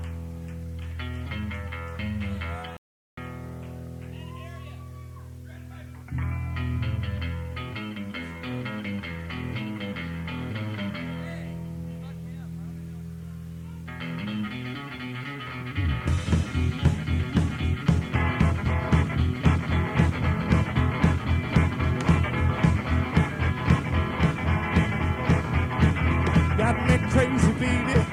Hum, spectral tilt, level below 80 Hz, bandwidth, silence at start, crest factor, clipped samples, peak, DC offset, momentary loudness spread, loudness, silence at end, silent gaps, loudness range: none; -7 dB/octave; -34 dBFS; 11 kHz; 0 s; 20 dB; under 0.1%; -6 dBFS; under 0.1%; 16 LU; -26 LUFS; 0 s; 2.78-3.17 s; 12 LU